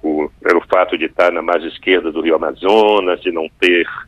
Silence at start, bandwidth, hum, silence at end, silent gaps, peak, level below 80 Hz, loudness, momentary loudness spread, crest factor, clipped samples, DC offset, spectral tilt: 0.05 s; 10.5 kHz; none; 0.05 s; none; 0 dBFS; -50 dBFS; -15 LUFS; 6 LU; 14 dB; under 0.1%; under 0.1%; -4.5 dB/octave